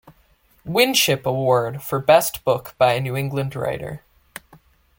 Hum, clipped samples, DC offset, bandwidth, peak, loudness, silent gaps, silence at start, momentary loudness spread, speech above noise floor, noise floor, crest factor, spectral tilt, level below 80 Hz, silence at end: none; under 0.1%; under 0.1%; 17 kHz; -2 dBFS; -20 LUFS; none; 0.65 s; 24 LU; 39 dB; -58 dBFS; 20 dB; -4 dB/octave; -54 dBFS; 1 s